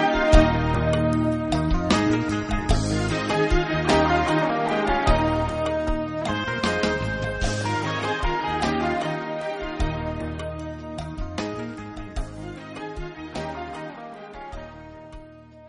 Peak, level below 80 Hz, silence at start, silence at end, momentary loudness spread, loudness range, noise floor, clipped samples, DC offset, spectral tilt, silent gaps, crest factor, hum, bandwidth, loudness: -2 dBFS; -32 dBFS; 0 s; 0 s; 15 LU; 12 LU; -45 dBFS; under 0.1%; under 0.1%; -5.5 dB/octave; none; 22 dB; none; 10.5 kHz; -24 LUFS